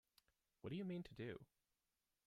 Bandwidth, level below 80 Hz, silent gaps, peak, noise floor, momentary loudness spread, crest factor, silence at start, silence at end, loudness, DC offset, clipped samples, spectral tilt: 14.5 kHz; -78 dBFS; none; -38 dBFS; under -90 dBFS; 10 LU; 16 dB; 0.65 s; 0.8 s; -52 LUFS; under 0.1%; under 0.1%; -8 dB/octave